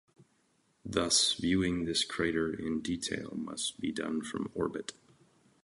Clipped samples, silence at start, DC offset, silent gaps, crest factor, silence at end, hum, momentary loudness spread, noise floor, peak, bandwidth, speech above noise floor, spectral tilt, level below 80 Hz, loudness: under 0.1%; 0.85 s; under 0.1%; none; 22 dB; 0.7 s; none; 12 LU; -72 dBFS; -14 dBFS; 11.5 kHz; 40 dB; -3 dB/octave; -58 dBFS; -32 LUFS